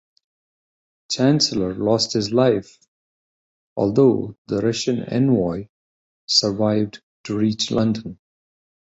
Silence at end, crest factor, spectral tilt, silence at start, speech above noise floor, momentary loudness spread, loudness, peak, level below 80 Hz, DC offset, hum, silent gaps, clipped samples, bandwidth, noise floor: 0.85 s; 18 dB; -5 dB/octave; 1.1 s; over 71 dB; 12 LU; -20 LUFS; -4 dBFS; -54 dBFS; under 0.1%; none; 2.88-3.76 s, 4.38-4.45 s, 5.69-6.28 s, 7.03-7.24 s; under 0.1%; 8.2 kHz; under -90 dBFS